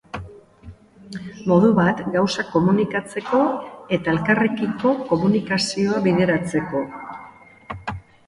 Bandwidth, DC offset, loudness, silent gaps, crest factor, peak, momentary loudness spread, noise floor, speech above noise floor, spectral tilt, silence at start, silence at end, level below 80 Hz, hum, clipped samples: 11.5 kHz; under 0.1%; -20 LUFS; none; 18 dB; -4 dBFS; 18 LU; -44 dBFS; 25 dB; -6 dB/octave; 0.15 s; 0.25 s; -50 dBFS; none; under 0.1%